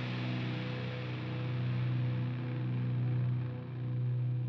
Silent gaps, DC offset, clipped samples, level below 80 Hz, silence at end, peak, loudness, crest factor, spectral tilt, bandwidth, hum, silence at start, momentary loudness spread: none; under 0.1%; under 0.1%; -68 dBFS; 0 s; -24 dBFS; -36 LUFS; 10 dB; -9 dB/octave; 5.8 kHz; none; 0 s; 5 LU